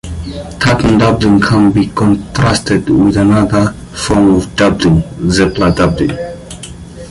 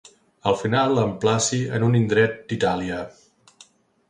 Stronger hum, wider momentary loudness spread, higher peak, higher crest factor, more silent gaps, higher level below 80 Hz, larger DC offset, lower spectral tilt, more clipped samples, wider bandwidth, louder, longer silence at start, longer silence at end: neither; first, 14 LU vs 9 LU; first, 0 dBFS vs -4 dBFS; second, 10 dB vs 18 dB; neither; first, -28 dBFS vs -54 dBFS; neither; about the same, -6 dB/octave vs -5 dB/octave; neither; about the same, 11.5 kHz vs 11 kHz; first, -11 LUFS vs -22 LUFS; second, 0.05 s vs 0.45 s; second, 0 s vs 1 s